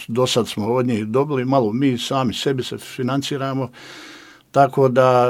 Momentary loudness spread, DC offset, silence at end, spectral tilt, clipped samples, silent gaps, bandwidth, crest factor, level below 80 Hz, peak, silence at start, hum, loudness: 14 LU; under 0.1%; 0 s; -6 dB/octave; under 0.1%; none; 16 kHz; 18 dB; -60 dBFS; 0 dBFS; 0 s; none; -19 LUFS